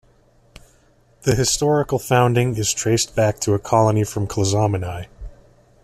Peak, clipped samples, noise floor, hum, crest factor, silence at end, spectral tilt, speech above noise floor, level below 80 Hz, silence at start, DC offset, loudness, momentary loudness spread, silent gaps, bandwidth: -2 dBFS; under 0.1%; -56 dBFS; none; 18 dB; 0.5 s; -5 dB/octave; 37 dB; -44 dBFS; 1.25 s; under 0.1%; -19 LUFS; 8 LU; none; 14.5 kHz